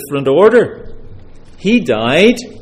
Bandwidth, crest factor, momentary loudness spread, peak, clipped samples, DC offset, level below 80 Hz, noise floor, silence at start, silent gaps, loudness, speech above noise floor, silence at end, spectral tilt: 15.5 kHz; 12 dB; 8 LU; 0 dBFS; under 0.1%; under 0.1%; -38 dBFS; -33 dBFS; 0 s; none; -12 LUFS; 22 dB; 0 s; -5.5 dB/octave